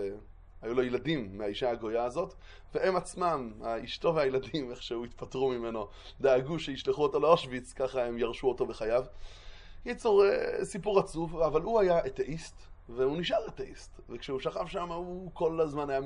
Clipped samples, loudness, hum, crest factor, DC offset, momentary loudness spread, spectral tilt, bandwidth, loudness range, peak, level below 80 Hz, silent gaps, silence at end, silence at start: under 0.1%; -31 LUFS; none; 22 dB; under 0.1%; 14 LU; -5.5 dB/octave; 11 kHz; 4 LU; -8 dBFS; -52 dBFS; none; 0 s; 0 s